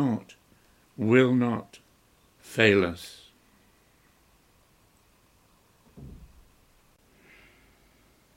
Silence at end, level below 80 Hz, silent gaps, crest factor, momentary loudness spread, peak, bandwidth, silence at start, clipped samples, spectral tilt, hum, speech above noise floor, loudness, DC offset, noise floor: 2.2 s; -60 dBFS; none; 26 dB; 29 LU; -6 dBFS; 16 kHz; 0 s; under 0.1%; -6.5 dB/octave; none; 39 dB; -24 LUFS; under 0.1%; -63 dBFS